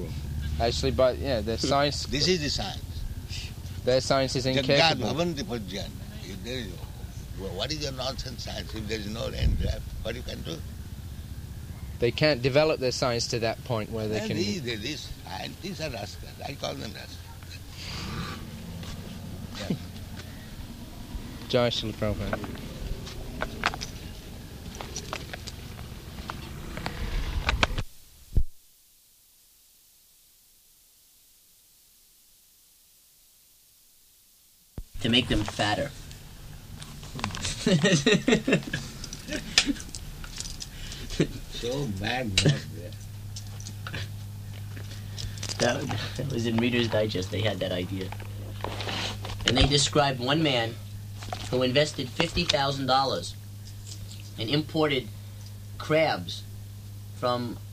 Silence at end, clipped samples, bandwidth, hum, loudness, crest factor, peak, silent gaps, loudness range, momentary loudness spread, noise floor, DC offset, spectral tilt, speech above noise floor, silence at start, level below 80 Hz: 0 s; under 0.1%; 15.5 kHz; none; -28 LUFS; 28 dB; -2 dBFS; none; 10 LU; 17 LU; -59 dBFS; under 0.1%; -4.5 dB/octave; 32 dB; 0 s; -40 dBFS